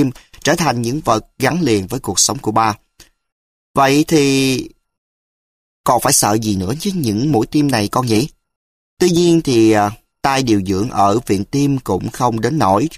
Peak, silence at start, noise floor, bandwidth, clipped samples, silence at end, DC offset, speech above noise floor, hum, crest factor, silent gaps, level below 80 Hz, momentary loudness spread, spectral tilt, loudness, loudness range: 0 dBFS; 0 s; under -90 dBFS; 15.5 kHz; under 0.1%; 0 s; under 0.1%; over 75 dB; none; 16 dB; 3.32-3.75 s, 4.98-5.84 s, 8.56-8.97 s; -44 dBFS; 8 LU; -4.5 dB/octave; -15 LUFS; 2 LU